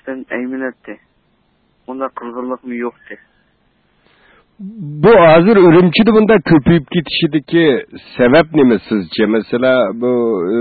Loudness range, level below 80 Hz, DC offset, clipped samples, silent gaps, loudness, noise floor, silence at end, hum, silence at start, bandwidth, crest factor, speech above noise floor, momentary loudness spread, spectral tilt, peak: 17 LU; -44 dBFS; under 0.1%; under 0.1%; none; -12 LUFS; -59 dBFS; 0 s; none; 0.05 s; 4.8 kHz; 12 dB; 46 dB; 18 LU; -12.5 dB/octave; 0 dBFS